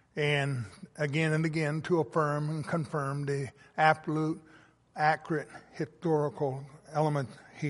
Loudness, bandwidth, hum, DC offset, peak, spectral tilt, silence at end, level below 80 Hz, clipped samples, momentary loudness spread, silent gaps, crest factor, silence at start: -31 LUFS; 11.5 kHz; none; under 0.1%; -10 dBFS; -6.5 dB/octave; 0 s; -70 dBFS; under 0.1%; 12 LU; none; 22 dB; 0.15 s